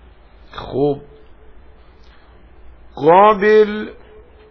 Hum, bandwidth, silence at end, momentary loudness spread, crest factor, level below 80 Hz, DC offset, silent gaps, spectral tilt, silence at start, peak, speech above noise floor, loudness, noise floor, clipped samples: none; 5.4 kHz; 0.6 s; 22 LU; 18 dB; -44 dBFS; under 0.1%; none; -8 dB/octave; 0.55 s; 0 dBFS; 31 dB; -14 LUFS; -44 dBFS; under 0.1%